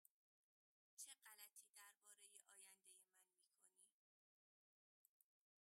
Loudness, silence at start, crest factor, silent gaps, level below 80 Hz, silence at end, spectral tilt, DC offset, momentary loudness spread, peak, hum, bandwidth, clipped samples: -64 LUFS; 0.95 s; 28 dB; 1.69-1.74 s, 3.92-5.20 s; under -90 dBFS; 0.45 s; 3 dB/octave; under 0.1%; 7 LU; -44 dBFS; none; 16 kHz; under 0.1%